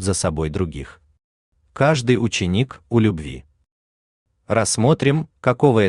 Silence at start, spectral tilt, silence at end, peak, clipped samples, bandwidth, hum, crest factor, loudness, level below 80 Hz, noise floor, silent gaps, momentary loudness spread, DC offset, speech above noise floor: 0 s; -5.5 dB/octave; 0 s; -2 dBFS; under 0.1%; 12.5 kHz; none; 18 dB; -20 LUFS; -44 dBFS; under -90 dBFS; 1.24-1.52 s, 3.71-4.26 s; 13 LU; under 0.1%; over 71 dB